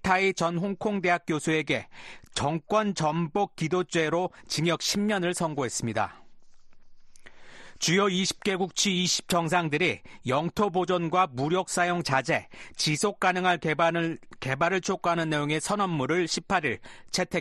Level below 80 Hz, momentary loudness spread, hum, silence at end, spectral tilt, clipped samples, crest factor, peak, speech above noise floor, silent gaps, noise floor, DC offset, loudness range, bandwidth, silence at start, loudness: -58 dBFS; 6 LU; none; 0 s; -4 dB/octave; under 0.1%; 18 dB; -8 dBFS; 21 dB; none; -48 dBFS; under 0.1%; 4 LU; 12.5 kHz; 0.05 s; -27 LUFS